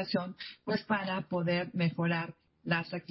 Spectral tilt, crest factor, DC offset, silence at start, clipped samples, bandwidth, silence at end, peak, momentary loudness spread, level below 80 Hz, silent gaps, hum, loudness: -10 dB/octave; 18 dB; under 0.1%; 0 s; under 0.1%; 5.8 kHz; 0.1 s; -16 dBFS; 11 LU; -70 dBFS; none; none; -33 LUFS